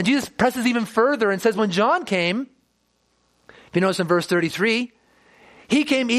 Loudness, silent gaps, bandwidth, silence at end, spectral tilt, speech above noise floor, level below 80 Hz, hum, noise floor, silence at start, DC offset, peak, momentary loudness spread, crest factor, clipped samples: -21 LUFS; none; 15 kHz; 0 s; -5 dB/octave; 47 dB; -62 dBFS; 60 Hz at -50 dBFS; -67 dBFS; 0 s; under 0.1%; -4 dBFS; 5 LU; 18 dB; under 0.1%